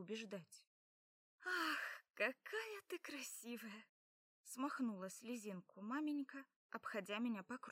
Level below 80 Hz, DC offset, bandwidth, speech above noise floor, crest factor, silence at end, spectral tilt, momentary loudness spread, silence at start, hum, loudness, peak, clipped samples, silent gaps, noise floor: under -90 dBFS; under 0.1%; 16 kHz; over 43 dB; 20 dB; 0 s; -3.5 dB/octave; 13 LU; 0 s; none; -47 LUFS; -28 dBFS; under 0.1%; 0.67-1.38 s, 3.89-4.44 s, 6.56-6.69 s; under -90 dBFS